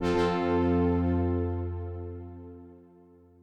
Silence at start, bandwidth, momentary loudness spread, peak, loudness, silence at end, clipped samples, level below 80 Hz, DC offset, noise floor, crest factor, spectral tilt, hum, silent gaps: 0 s; 8.4 kHz; 20 LU; -16 dBFS; -28 LUFS; 0.65 s; under 0.1%; -44 dBFS; under 0.1%; -56 dBFS; 14 dB; -8 dB/octave; none; none